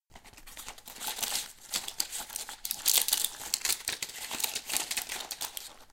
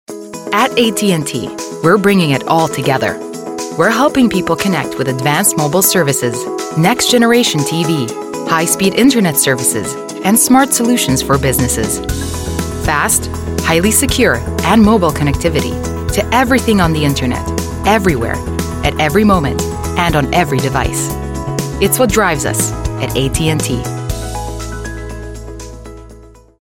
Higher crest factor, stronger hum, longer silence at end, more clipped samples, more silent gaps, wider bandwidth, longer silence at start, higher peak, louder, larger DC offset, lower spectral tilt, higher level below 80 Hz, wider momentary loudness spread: first, 28 dB vs 14 dB; neither; second, 0 s vs 0.3 s; neither; neither; about the same, 17 kHz vs 17 kHz; about the same, 0.1 s vs 0.1 s; second, -6 dBFS vs 0 dBFS; second, -31 LUFS vs -13 LUFS; neither; second, 2 dB/octave vs -4 dB/octave; second, -62 dBFS vs -28 dBFS; first, 18 LU vs 11 LU